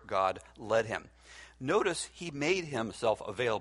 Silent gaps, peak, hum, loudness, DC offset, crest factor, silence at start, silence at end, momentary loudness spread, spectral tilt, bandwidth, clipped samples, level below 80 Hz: none; -14 dBFS; none; -33 LUFS; under 0.1%; 18 dB; 0.05 s; 0 s; 13 LU; -4 dB/octave; 11.5 kHz; under 0.1%; -62 dBFS